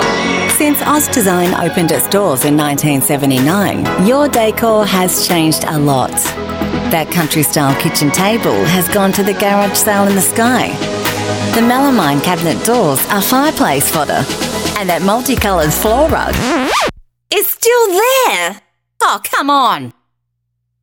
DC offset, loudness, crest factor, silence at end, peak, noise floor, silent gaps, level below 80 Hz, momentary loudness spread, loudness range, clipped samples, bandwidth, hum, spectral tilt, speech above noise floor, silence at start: under 0.1%; -12 LUFS; 12 dB; 0.9 s; 0 dBFS; -69 dBFS; none; -36 dBFS; 5 LU; 1 LU; under 0.1%; 19 kHz; none; -4 dB/octave; 57 dB; 0 s